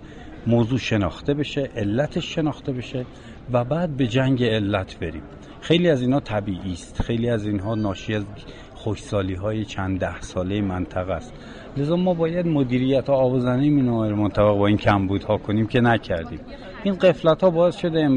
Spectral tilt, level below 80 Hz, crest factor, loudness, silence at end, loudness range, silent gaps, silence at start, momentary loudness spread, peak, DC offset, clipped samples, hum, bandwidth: -7.5 dB/octave; -42 dBFS; 16 dB; -22 LUFS; 0 s; 7 LU; none; 0 s; 13 LU; -6 dBFS; under 0.1%; under 0.1%; none; 9.8 kHz